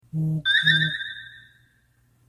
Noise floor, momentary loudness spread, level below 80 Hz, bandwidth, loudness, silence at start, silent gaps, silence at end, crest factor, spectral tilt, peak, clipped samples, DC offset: -63 dBFS; 16 LU; -60 dBFS; 12.5 kHz; -21 LUFS; 0.15 s; none; 0.9 s; 20 dB; -4.5 dB/octave; -6 dBFS; under 0.1%; under 0.1%